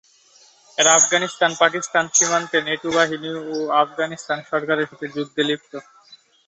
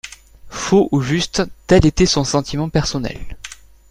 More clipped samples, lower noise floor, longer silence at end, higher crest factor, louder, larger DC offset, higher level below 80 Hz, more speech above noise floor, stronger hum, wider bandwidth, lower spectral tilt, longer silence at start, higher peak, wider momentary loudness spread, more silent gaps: neither; first, -53 dBFS vs -38 dBFS; about the same, 0.35 s vs 0.35 s; about the same, 20 dB vs 16 dB; about the same, -19 LUFS vs -17 LUFS; neither; second, -68 dBFS vs -32 dBFS; first, 33 dB vs 22 dB; neither; second, 8.4 kHz vs 15 kHz; second, -1.5 dB/octave vs -5 dB/octave; first, 0.8 s vs 0.05 s; about the same, -2 dBFS vs -2 dBFS; second, 13 LU vs 20 LU; neither